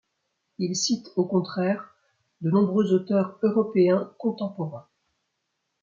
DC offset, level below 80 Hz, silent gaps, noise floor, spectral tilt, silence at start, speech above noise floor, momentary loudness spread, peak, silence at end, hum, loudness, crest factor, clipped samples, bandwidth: under 0.1%; -72 dBFS; none; -79 dBFS; -6 dB/octave; 0.6 s; 55 dB; 10 LU; -10 dBFS; 1 s; none; -25 LUFS; 16 dB; under 0.1%; 7.6 kHz